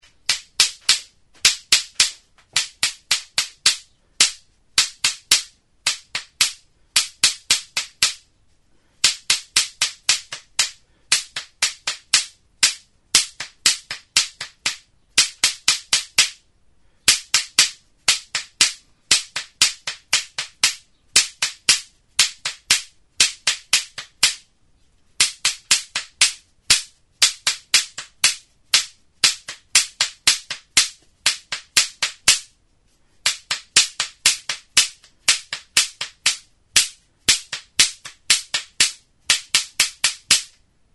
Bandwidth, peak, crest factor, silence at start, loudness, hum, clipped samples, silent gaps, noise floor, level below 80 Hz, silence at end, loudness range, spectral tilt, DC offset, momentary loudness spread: over 20 kHz; 0 dBFS; 22 dB; 0.3 s; -19 LUFS; none; under 0.1%; none; -61 dBFS; -56 dBFS; 0.5 s; 2 LU; 2.5 dB/octave; under 0.1%; 9 LU